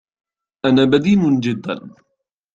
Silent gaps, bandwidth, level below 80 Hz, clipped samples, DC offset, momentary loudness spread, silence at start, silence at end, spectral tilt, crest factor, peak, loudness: none; 7.8 kHz; -54 dBFS; under 0.1%; under 0.1%; 13 LU; 0.65 s; 0.65 s; -7 dB/octave; 16 dB; -2 dBFS; -16 LUFS